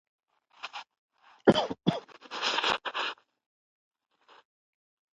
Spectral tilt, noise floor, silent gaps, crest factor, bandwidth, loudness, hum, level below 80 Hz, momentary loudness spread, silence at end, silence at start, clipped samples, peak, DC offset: -4.5 dB/octave; -48 dBFS; 0.98-1.09 s; 26 dB; 8.4 kHz; -29 LUFS; none; -68 dBFS; 19 LU; 2 s; 0.65 s; under 0.1%; -8 dBFS; under 0.1%